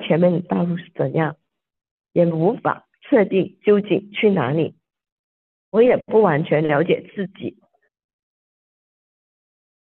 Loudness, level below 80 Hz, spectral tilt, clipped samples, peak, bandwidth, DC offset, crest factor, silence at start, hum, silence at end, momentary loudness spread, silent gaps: -19 LUFS; -64 dBFS; -10.5 dB/octave; under 0.1%; -4 dBFS; 4.2 kHz; under 0.1%; 16 dB; 0 s; none; 2.4 s; 11 LU; 1.91-1.98 s, 5.12-5.72 s